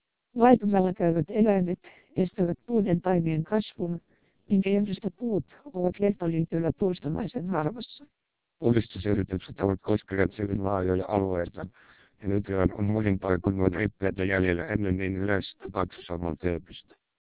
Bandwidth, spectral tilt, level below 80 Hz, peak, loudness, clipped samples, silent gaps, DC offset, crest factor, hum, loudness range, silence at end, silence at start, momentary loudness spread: 4 kHz; -11.5 dB/octave; -46 dBFS; -6 dBFS; -28 LUFS; under 0.1%; none; 0.2%; 20 dB; none; 3 LU; 0.45 s; 0.35 s; 10 LU